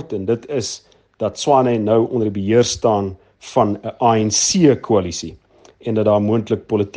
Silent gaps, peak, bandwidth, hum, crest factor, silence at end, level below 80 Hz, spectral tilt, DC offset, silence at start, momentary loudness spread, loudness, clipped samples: none; 0 dBFS; 10.5 kHz; none; 16 dB; 0.05 s; -52 dBFS; -5 dB/octave; under 0.1%; 0 s; 13 LU; -17 LUFS; under 0.1%